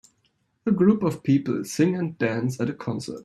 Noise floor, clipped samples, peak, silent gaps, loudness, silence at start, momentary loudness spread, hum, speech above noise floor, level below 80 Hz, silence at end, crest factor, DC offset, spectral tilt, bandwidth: -69 dBFS; under 0.1%; -6 dBFS; none; -24 LUFS; 0.65 s; 10 LU; none; 46 dB; -62 dBFS; 0 s; 18 dB; under 0.1%; -7 dB/octave; 13.5 kHz